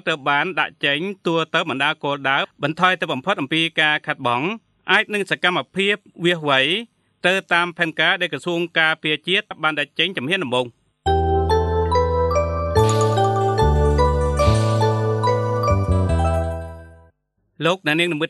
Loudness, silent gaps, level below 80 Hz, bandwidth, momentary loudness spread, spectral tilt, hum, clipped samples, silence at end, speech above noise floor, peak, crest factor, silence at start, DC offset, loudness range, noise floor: -19 LUFS; none; -32 dBFS; 12 kHz; 5 LU; -5.5 dB/octave; none; under 0.1%; 0 s; 46 dB; -2 dBFS; 18 dB; 0.05 s; under 0.1%; 2 LU; -66 dBFS